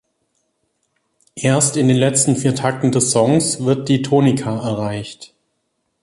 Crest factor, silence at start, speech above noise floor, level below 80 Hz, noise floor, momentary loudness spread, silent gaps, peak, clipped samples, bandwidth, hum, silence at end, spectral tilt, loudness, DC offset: 16 dB; 1.35 s; 54 dB; -54 dBFS; -70 dBFS; 9 LU; none; -2 dBFS; under 0.1%; 11.5 kHz; none; 0.75 s; -5 dB/octave; -16 LUFS; under 0.1%